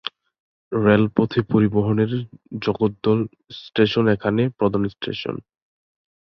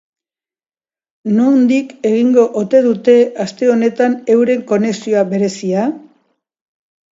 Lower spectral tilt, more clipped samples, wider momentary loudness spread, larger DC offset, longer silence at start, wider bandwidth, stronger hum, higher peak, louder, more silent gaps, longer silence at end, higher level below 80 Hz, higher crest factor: first, -9 dB/octave vs -6.5 dB/octave; neither; first, 13 LU vs 6 LU; neither; second, 0.05 s vs 1.25 s; second, 6 kHz vs 7.8 kHz; neither; about the same, -2 dBFS vs 0 dBFS; second, -21 LUFS vs -13 LUFS; first, 0.40-0.71 s vs none; second, 0.8 s vs 1.15 s; first, -52 dBFS vs -66 dBFS; first, 20 dB vs 14 dB